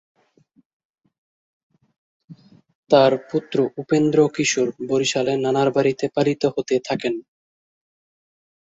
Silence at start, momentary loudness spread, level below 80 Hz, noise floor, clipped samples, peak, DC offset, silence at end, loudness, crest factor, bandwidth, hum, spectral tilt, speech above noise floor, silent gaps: 2.3 s; 8 LU; -64 dBFS; -60 dBFS; under 0.1%; -2 dBFS; under 0.1%; 1.5 s; -20 LUFS; 20 dB; 8 kHz; none; -5 dB/octave; 41 dB; 2.75-2.83 s